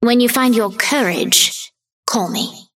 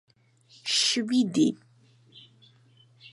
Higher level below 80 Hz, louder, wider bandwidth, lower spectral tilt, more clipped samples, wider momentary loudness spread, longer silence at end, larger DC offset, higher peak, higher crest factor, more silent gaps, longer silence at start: first, -66 dBFS vs -80 dBFS; first, -15 LUFS vs -25 LUFS; first, 17 kHz vs 11.5 kHz; about the same, -2 dB/octave vs -3 dB/octave; neither; about the same, 13 LU vs 12 LU; about the same, 0.15 s vs 0.05 s; neither; first, 0 dBFS vs -12 dBFS; about the same, 16 dB vs 18 dB; first, 1.93-2.03 s vs none; second, 0 s vs 0.65 s